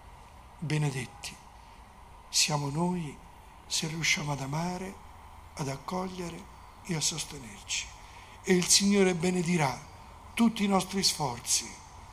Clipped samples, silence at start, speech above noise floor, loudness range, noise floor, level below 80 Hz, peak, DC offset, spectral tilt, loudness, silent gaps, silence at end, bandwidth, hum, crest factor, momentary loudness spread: under 0.1%; 0 s; 22 dB; 9 LU; -51 dBFS; -54 dBFS; -10 dBFS; under 0.1%; -3.5 dB/octave; -29 LUFS; none; 0 s; 15.5 kHz; none; 22 dB; 21 LU